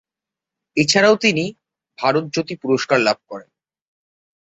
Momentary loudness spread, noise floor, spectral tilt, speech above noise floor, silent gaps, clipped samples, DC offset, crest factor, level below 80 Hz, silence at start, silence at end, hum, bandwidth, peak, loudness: 13 LU; -87 dBFS; -4 dB/octave; 69 dB; none; under 0.1%; under 0.1%; 18 dB; -60 dBFS; 0.75 s; 1.05 s; none; 8.4 kHz; -2 dBFS; -18 LUFS